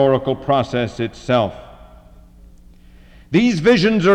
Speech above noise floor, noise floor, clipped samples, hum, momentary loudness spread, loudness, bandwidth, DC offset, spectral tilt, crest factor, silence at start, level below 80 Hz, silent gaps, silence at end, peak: 28 dB; -44 dBFS; under 0.1%; none; 11 LU; -17 LUFS; 9.6 kHz; under 0.1%; -6.5 dB/octave; 14 dB; 0 s; -44 dBFS; none; 0 s; -4 dBFS